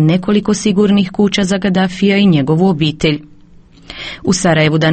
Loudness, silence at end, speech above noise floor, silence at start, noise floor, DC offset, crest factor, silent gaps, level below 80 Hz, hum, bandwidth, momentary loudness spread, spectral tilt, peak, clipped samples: -13 LUFS; 0 s; 29 dB; 0 s; -41 dBFS; under 0.1%; 12 dB; none; -40 dBFS; none; 8.8 kHz; 9 LU; -5.5 dB/octave; 0 dBFS; under 0.1%